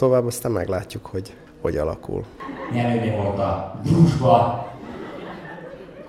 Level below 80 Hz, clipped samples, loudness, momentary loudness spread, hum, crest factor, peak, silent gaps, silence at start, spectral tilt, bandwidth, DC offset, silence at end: -44 dBFS; under 0.1%; -22 LUFS; 18 LU; none; 20 dB; -2 dBFS; none; 0 s; -7.5 dB/octave; 14.5 kHz; under 0.1%; 0 s